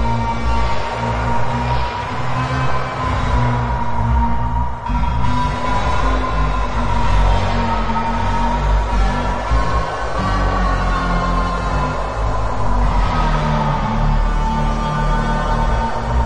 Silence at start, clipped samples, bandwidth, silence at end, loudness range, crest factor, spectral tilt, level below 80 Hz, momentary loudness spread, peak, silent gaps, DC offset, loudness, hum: 0 s; under 0.1%; 9.4 kHz; 0 s; 1 LU; 14 dB; -6.5 dB/octave; -20 dBFS; 3 LU; -2 dBFS; none; under 0.1%; -19 LUFS; none